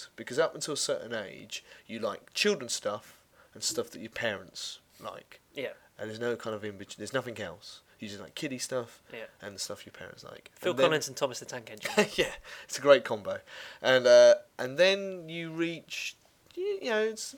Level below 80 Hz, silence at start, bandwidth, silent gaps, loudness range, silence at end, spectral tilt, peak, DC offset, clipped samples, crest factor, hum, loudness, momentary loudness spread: -68 dBFS; 0 s; 18 kHz; none; 13 LU; 0 s; -3 dB/octave; -6 dBFS; under 0.1%; under 0.1%; 24 dB; none; -29 LUFS; 20 LU